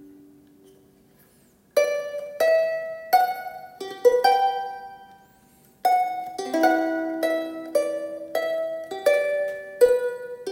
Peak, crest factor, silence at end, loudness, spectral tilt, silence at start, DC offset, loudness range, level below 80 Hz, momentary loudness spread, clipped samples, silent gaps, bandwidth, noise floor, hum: -6 dBFS; 20 dB; 0 s; -24 LUFS; -3 dB/octave; 0 s; under 0.1%; 3 LU; -70 dBFS; 13 LU; under 0.1%; none; 17 kHz; -58 dBFS; none